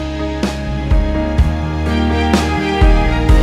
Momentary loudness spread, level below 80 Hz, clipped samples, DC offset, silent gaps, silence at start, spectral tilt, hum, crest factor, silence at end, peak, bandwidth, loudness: 6 LU; -16 dBFS; under 0.1%; under 0.1%; none; 0 s; -6.5 dB/octave; none; 12 dB; 0 s; 0 dBFS; 12.5 kHz; -16 LUFS